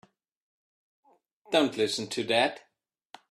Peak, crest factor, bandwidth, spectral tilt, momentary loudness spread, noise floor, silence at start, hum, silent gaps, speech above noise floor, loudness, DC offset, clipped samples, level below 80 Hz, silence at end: -8 dBFS; 22 dB; 13.5 kHz; -3.5 dB/octave; 6 LU; -55 dBFS; 1.5 s; none; none; 28 dB; -27 LUFS; under 0.1%; under 0.1%; -76 dBFS; 0.7 s